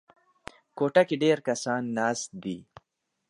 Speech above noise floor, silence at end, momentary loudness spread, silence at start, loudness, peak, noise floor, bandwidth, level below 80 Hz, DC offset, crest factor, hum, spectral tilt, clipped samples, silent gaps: 23 dB; 0.65 s; 23 LU; 0.75 s; -27 LUFS; -8 dBFS; -49 dBFS; 11.5 kHz; -70 dBFS; under 0.1%; 22 dB; none; -4.5 dB/octave; under 0.1%; none